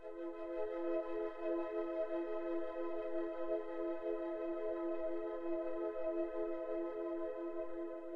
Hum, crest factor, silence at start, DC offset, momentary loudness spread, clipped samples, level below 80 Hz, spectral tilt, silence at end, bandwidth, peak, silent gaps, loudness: none; 12 dB; 0 s; under 0.1%; 4 LU; under 0.1%; -68 dBFS; -7.5 dB/octave; 0 s; 4.7 kHz; -28 dBFS; none; -41 LUFS